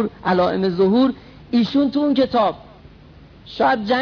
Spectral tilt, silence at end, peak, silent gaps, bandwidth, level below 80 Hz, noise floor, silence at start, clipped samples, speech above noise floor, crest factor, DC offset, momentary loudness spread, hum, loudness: -7.5 dB/octave; 0 s; -6 dBFS; none; 5.4 kHz; -50 dBFS; -44 dBFS; 0 s; under 0.1%; 27 dB; 14 dB; under 0.1%; 6 LU; none; -18 LUFS